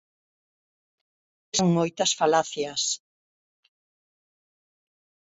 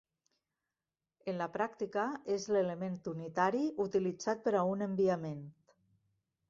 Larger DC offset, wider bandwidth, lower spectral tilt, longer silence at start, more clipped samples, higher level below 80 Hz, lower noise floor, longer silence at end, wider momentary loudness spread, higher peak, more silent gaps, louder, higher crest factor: neither; about the same, 8 kHz vs 7.6 kHz; second, -3.5 dB/octave vs -6 dB/octave; first, 1.55 s vs 1.25 s; neither; first, -68 dBFS vs -76 dBFS; about the same, under -90 dBFS vs under -90 dBFS; first, 2.35 s vs 1 s; about the same, 7 LU vs 9 LU; first, -8 dBFS vs -16 dBFS; neither; first, -24 LUFS vs -35 LUFS; about the same, 22 dB vs 20 dB